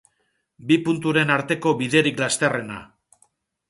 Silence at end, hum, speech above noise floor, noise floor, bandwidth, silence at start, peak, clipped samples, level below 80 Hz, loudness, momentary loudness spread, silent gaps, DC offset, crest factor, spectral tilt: 0.85 s; none; 50 dB; -71 dBFS; 11.5 kHz; 0.6 s; -2 dBFS; under 0.1%; -62 dBFS; -21 LUFS; 14 LU; none; under 0.1%; 20 dB; -4.5 dB/octave